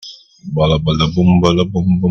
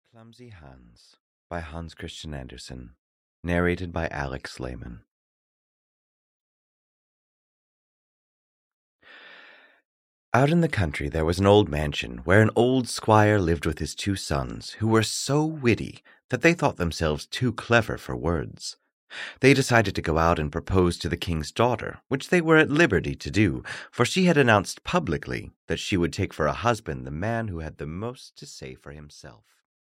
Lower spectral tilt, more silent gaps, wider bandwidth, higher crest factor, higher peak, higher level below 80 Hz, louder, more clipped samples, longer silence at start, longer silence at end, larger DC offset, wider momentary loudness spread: first, -7 dB/octave vs -5.5 dB/octave; second, none vs 1.20-1.50 s, 2.99-3.43 s, 5.11-8.99 s, 9.85-10.32 s, 16.24-16.29 s, 18.93-19.08 s, 25.56-25.68 s; second, 7 kHz vs 16 kHz; second, 14 dB vs 22 dB; first, 0 dBFS vs -4 dBFS; first, -34 dBFS vs -44 dBFS; first, -14 LUFS vs -24 LUFS; neither; second, 0.05 s vs 0.2 s; second, 0 s vs 0.7 s; neither; second, 15 LU vs 18 LU